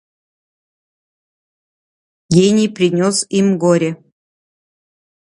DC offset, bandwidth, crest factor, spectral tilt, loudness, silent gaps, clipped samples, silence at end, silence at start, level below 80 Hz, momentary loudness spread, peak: under 0.1%; 11.5 kHz; 18 dB; -5.5 dB/octave; -14 LUFS; none; under 0.1%; 1.25 s; 2.3 s; -58 dBFS; 5 LU; 0 dBFS